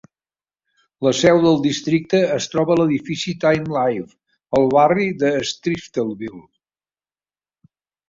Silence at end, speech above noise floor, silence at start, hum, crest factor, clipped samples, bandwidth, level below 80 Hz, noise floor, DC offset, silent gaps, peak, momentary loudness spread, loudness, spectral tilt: 1.7 s; over 72 dB; 1 s; none; 18 dB; under 0.1%; 7.8 kHz; -58 dBFS; under -90 dBFS; under 0.1%; none; -2 dBFS; 10 LU; -18 LUFS; -5.5 dB/octave